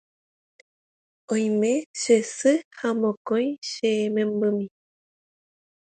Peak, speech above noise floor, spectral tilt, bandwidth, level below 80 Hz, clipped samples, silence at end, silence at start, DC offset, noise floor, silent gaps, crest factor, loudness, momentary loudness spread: -8 dBFS; over 67 dB; -4.5 dB/octave; 9.4 kHz; -76 dBFS; under 0.1%; 1.25 s; 1.3 s; under 0.1%; under -90 dBFS; 1.86-1.94 s, 2.65-2.71 s, 3.17-3.25 s, 3.58-3.62 s; 18 dB; -24 LUFS; 7 LU